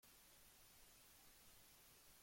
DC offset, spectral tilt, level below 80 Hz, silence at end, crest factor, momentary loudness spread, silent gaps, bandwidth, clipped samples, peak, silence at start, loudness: under 0.1%; -1.5 dB/octave; -80 dBFS; 0 s; 14 dB; 0 LU; none; 16.5 kHz; under 0.1%; -56 dBFS; 0 s; -66 LUFS